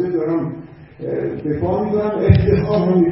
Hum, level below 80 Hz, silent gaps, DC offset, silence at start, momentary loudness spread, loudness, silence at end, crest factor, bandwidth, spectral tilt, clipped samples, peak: none; -32 dBFS; none; under 0.1%; 0 s; 12 LU; -18 LUFS; 0 s; 16 dB; 5.8 kHz; -13 dB/octave; under 0.1%; 0 dBFS